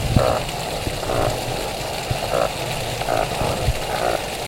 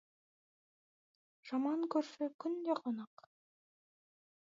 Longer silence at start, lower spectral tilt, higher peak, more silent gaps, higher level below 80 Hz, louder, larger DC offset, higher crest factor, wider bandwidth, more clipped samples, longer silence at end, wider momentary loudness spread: second, 0 s vs 1.45 s; about the same, -4.5 dB/octave vs -4.5 dB/octave; first, 0 dBFS vs -22 dBFS; second, none vs 2.34-2.39 s; first, -32 dBFS vs under -90 dBFS; first, -23 LUFS vs -39 LUFS; neither; about the same, 22 dB vs 20 dB; first, 16.5 kHz vs 7.4 kHz; neither; second, 0 s vs 1.45 s; second, 4 LU vs 10 LU